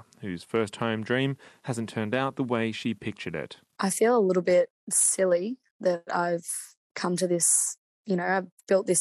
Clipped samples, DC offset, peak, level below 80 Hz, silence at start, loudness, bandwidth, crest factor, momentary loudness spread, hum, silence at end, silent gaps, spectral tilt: under 0.1%; under 0.1%; -10 dBFS; -74 dBFS; 0.2 s; -26 LUFS; 13.5 kHz; 16 dB; 13 LU; none; 0 s; 4.70-4.87 s, 5.71-5.80 s, 6.77-6.95 s, 7.78-8.05 s, 8.52-8.58 s; -4 dB/octave